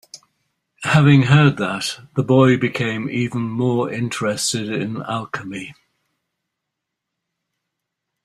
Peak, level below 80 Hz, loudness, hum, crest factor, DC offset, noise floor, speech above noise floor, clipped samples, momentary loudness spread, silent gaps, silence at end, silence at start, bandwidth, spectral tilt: -2 dBFS; -54 dBFS; -18 LUFS; none; 18 dB; under 0.1%; -80 dBFS; 63 dB; under 0.1%; 15 LU; none; 2.55 s; 0.15 s; 13 kHz; -5.5 dB/octave